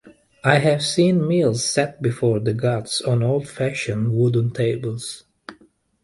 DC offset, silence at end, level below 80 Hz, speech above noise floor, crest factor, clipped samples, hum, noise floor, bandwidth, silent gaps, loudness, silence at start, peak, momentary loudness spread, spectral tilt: under 0.1%; 0.5 s; -56 dBFS; 36 dB; 20 dB; under 0.1%; none; -56 dBFS; 11.5 kHz; none; -20 LUFS; 0.05 s; 0 dBFS; 8 LU; -5.5 dB/octave